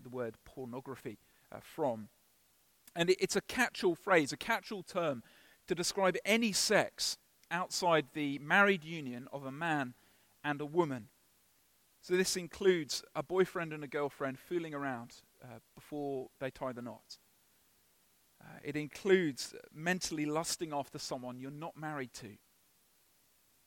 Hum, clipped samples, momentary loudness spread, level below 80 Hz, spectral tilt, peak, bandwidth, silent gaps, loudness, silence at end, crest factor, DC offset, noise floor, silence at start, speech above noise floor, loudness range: none; under 0.1%; 17 LU; -72 dBFS; -3.5 dB/octave; -14 dBFS; 17 kHz; none; -35 LUFS; 1.3 s; 22 dB; under 0.1%; -71 dBFS; 0 s; 36 dB; 10 LU